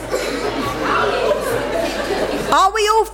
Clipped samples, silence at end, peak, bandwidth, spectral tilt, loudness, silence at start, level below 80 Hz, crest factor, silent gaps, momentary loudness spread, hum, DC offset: under 0.1%; 0 s; -4 dBFS; 16.5 kHz; -3.5 dB/octave; -18 LUFS; 0 s; -38 dBFS; 14 dB; none; 7 LU; none; under 0.1%